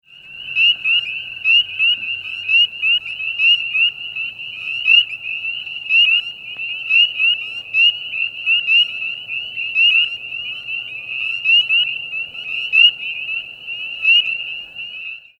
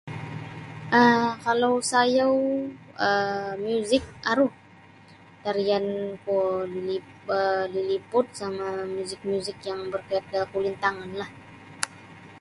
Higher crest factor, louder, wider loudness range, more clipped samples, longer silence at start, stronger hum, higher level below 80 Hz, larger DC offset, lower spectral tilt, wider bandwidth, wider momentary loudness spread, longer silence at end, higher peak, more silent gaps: second, 16 dB vs 24 dB; first, -15 LUFS vs -26 LUFS; second, 2 LU vs 7 LU; neither; about the same, 0.15 s vs 0.05 s; neither; about the same, -64 dBFS vs -62 dBFS; neither; second, 0.5 dB/octave vs -4.5 dB/octave; second, 8.2 kHz vs 11.5 kHz; about the same, 13 LU vs 14 LU; first, 0.2 s vs 0 s; about the same, -2 dBFS vs -2 dBFS; neither